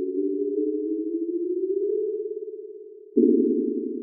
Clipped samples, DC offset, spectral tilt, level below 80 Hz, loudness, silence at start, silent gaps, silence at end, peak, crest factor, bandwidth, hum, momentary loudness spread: under 0.1%; under 0.1%; -12.5 dB/octave; under -90 dBFS; -25 LUFS; 0 s; none; 0 s; -8 dBFS; 18 dB; 0.6 kHz; none; 15 LU